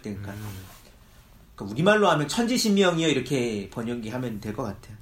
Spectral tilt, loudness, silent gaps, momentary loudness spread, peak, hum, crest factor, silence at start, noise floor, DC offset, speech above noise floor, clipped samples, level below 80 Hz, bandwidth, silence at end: -4.5 dB/octave; -24 LUFS; none; 17 LU; -6 dBFS; none; 20 dB; 0.05 s; -52 dBFS; under 0.1%; 27 dB; under 0.1%; -54 dBFS; 16 kHz; 0.05 s